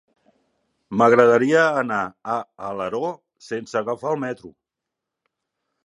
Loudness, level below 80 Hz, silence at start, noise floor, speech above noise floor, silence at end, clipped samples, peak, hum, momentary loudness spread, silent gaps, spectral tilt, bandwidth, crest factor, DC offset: -21 LUFS; -66 dBFS; 0.9 s; -84 dBFS; 64 dB; 1.35 s; under 0.1%; 0 dBFS; none; 17 LU; none; -6 dB/octave; 10.5 kHz; 22 dB; under 0.1%